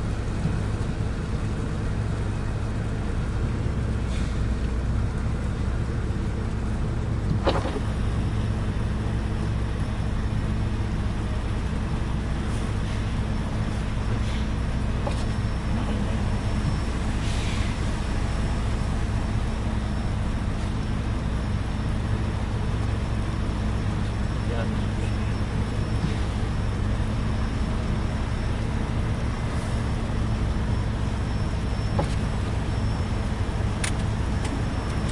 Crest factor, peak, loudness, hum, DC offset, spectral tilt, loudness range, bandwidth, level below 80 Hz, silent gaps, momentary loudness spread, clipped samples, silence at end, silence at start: 16 dB; -8 dBFS; -27 LUFS; none; under 0.1%; -6.5 dB/octave; 1 LU; 11.5 kHz; -28 dBFS; none; 2 LU; under 0.1%; 0 s; 0 s